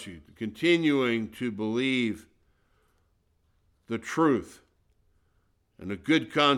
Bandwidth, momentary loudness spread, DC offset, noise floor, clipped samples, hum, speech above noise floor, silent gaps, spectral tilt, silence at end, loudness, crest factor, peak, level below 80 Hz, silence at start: 13 kHz; 15 LU; under 0.1%; -70 dBFS; under 0.1%; none; 43 dB; none; -5 dB/octave; 0 s; -27 LUFS; 20 dB; -10 dBFS; -64 dBFS; 0 s